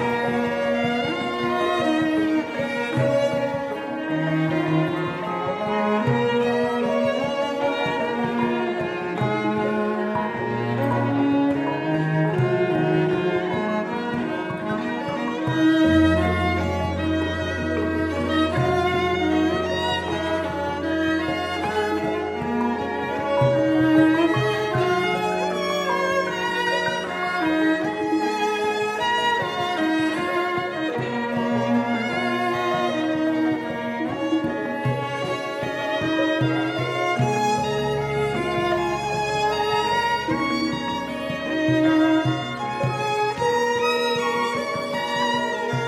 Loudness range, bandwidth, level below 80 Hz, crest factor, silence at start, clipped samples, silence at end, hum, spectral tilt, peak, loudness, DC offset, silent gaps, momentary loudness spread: 3 LU; 14 kHz; -48 dBFS; 16 dB; 0 s; under 0.1%; 0 s; none; -6 dB/octave; -6 dBFS; -23 LUFS; under 0.1%; none; 6 LU